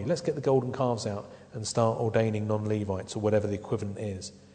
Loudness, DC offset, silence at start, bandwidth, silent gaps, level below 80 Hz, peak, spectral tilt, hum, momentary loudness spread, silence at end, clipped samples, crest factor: -29 LUFS; under 0.1%; 0 s; 9.4 kHz; none; -62 dBFS; -10 dBFS; -6 dB/octave; none; 10 LU; 0.15 s; under 0.1%; 18 dB